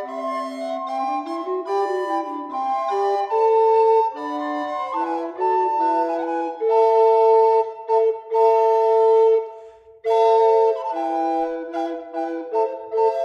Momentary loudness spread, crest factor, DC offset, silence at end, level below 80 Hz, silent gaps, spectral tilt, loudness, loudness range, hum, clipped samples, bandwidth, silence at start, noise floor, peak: 12 LU; 14 dB; under 0.1%; 0 s; -74 dBFS; none; -4 dB/octave; -20 LUFS; 4 LU; none; under 0.1%; 7.4 kHz; 0 s; -43 dBFS; -6 dBFS